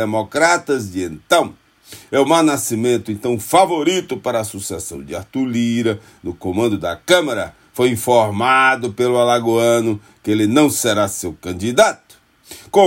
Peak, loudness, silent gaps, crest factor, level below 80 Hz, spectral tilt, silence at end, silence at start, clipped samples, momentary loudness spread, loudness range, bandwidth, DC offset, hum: 0 dBFS; -17 LUFS; none; 16 dB; -56 dBFS; -4 dB/octave; 0 s; 0 s; under 0.1%; 12 LU; 4 LU; 16.5 kHz; under 0.1%; none